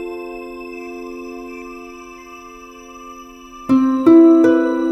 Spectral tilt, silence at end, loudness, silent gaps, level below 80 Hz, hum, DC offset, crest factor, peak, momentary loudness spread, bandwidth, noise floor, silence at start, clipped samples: -6.5 dB/octave; 0 s; -12 LUFS; none; -52 dBFS; none; under 0.1%; 16 dB; 0 dBFS; 27 LU; 6.2 kHz; -38 dBFS; 0 s; under 0.1%